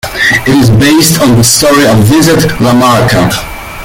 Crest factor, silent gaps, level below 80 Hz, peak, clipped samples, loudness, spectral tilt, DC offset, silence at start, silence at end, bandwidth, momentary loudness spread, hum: 6 dB; none; -28 dBFS; 0 dBFS; 0.4%; -6 LUFS; -4.5 dB/octave; under 0.1%; 0.05 s; 0 s; over 20 kHz; 4 LU; none